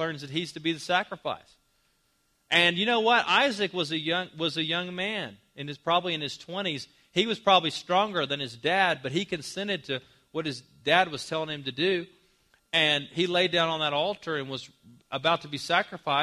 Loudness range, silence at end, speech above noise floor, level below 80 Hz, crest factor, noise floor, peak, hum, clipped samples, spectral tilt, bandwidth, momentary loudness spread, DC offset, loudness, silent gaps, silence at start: 4 LU; 0 s; 43 dB; -70 dBFS; 22 dB; -71 dBFS; -6 dBFS; none; under 0.1%; -4 dB/octave; 14 kHz; 13 LU; under 0.1%; -27 LUFS; none; 0 s